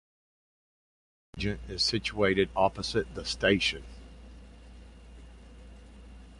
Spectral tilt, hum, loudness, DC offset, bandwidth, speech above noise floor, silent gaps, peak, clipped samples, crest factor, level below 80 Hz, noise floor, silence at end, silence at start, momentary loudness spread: -4 dB/octave; none; -28 LUFS; under 0.1%; 11.5 kHz; 21 dB; none; -10 dBFS; under 0.1%; 24 dB; -48 dBFS; -50 dBFS; 0 s; 1.35 s; 24 LU